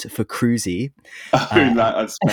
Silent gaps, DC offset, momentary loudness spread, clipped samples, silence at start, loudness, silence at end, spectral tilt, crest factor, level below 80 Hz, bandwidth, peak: none; under 0.1%; 12 LU; under 0.1%; 0 s; -19 LUFS; 0 s; -5 dB/octave; 18 dB; -50 dBFS; 18.5 kHz; 0 dBFS